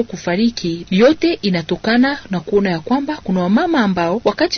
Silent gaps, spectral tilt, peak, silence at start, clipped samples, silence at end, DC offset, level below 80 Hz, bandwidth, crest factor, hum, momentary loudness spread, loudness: none; -6 dB/octave; -2 dBFS; 0 s; under 0.1%; 0 s; under 0.1%; -46 dBFS; 6.6 kHz; 14 dB; none; 6 LU; -16 LUFS